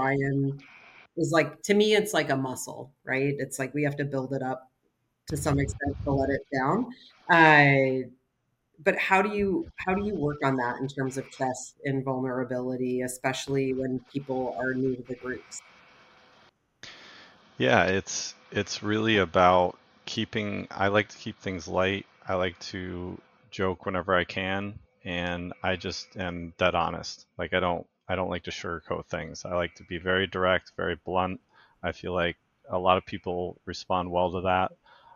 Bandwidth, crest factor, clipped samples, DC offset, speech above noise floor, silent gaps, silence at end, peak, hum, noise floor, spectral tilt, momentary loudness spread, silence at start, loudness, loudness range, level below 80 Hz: 16 kHz; 24 dB; under 0.1%; under 0.1%; 49 dB; none; 0.45 s; -4 dBFS; none; -76 dBFS; -5 dB/octave; 13 LU; 0 s; -27 LUFS; 8 LU; -54 dBFS